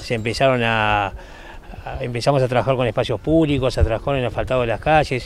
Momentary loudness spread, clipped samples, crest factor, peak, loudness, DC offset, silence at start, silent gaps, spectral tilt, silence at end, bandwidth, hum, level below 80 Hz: 16 LU; under 0.1%; 18 dB; -2 dBFS; -19 LUFS; under 0.1%; 0 s; none; -6 dB/octave; 0 s; 13.5 kHz; none; -32 dBFS